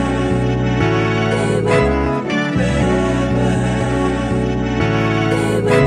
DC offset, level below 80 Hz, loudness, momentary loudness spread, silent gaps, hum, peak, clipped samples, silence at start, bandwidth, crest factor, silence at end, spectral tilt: under 0.1%; -28 dBFS; -17 LUFS; 3 LU; none; none; 0 dBFS; under 0.1%; 0 s; 11 kHz; 16 dB; 0 s; -6.5 dB/octave